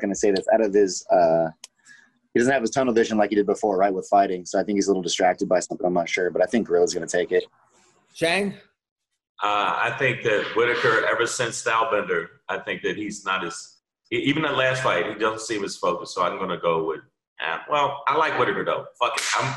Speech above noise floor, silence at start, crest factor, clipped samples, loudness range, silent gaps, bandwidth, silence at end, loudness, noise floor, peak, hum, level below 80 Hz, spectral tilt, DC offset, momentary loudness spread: 38 dB; 0 s; 14 dB; under 0.1%; 4 LU; 8.91-8.96 s, 9.29-9.35 s, 17.27-17.36 s; 12 kHz; 0 s; -23 LUFS; -60 dBFS; -8 dBFS; none; -62 dBFS; -4 dB/octave; under 0.1%; 8 LU